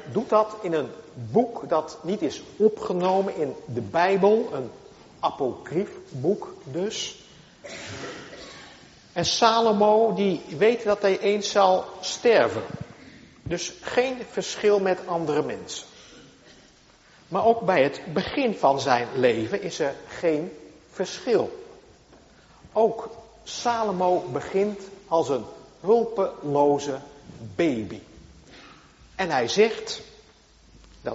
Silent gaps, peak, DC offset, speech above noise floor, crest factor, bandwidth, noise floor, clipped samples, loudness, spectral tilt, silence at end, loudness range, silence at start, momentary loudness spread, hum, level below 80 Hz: none; -4 dBFS; under 0.1%; 31 dB; 22 dB; 8 kHz; -55 dBFS; under 0.1%; -24 LUFS; -3.5 dB/octave; 0 s; 7 LU; 0 s; 17 LU; none; -60 dBFS